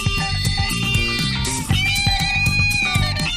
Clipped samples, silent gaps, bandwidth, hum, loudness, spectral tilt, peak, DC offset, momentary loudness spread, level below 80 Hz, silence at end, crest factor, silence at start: under 0.1%; none; 15.5 kHz; none; -18 LUFS; -3 dB/octave; -4 dBFS; under 0.1%; 4 LU; -28 dBFS; 0 s; 14 dB; 0 s